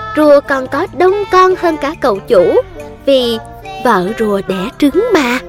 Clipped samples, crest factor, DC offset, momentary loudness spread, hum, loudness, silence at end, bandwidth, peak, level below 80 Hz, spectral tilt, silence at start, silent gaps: 0.1%; 12 dB; under 0.1%; 9 LU; none; -12 LUFS; 0 s; 16.5 kHz; 0 dBFS; -40 dBFS; -5.5 dB/octave; 0 s; none